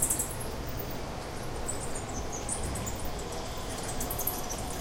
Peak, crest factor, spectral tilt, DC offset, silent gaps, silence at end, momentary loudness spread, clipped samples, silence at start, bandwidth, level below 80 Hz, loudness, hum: -12 dBFS; 22 dB; -3.5 dB/octave; under 0.1%; none; 0 s; 6 LU; under 0.1%; 0 s; 17 kHz; -40 dBFS; -35 LUFS; none